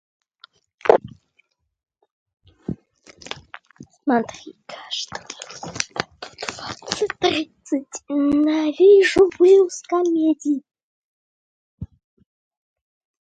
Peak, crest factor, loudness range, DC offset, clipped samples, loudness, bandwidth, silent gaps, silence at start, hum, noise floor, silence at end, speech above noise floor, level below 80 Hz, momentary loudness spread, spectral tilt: 0 dBFS; 22 dB; 12 LU; under 0.1%; under 0.1%; -19 LUFS; 9.2 kHz; 2.11-2.26 s, 10.83-11.78 s; 0.85 s; none; -66 dBFS; 1.35 s; 48 dB; -56 dBFS; 22 LU; -4 dB/octave